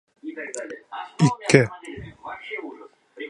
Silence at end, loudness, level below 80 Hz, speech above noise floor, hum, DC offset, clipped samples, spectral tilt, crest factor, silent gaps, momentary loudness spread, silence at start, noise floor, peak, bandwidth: 0 s; -23 LUFS; -58 dBFS; 25 dB; none; under 0.1%; under 0.1%; -5.5 dB/octave; 26 dB; none; 20 LU; 0.25 s; -45 dBFS; 0 dBFS; 11.5 kHz